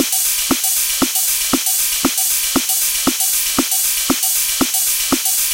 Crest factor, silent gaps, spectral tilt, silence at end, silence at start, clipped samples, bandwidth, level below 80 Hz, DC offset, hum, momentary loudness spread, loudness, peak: 16 dB; none; -0.5 dB/octave; 0 s; 0 s; under 0.1%; 17.5 kHz; -44 dBFS; under 0.1%; none; 1 LU; -14 LUFS; -2 dBFS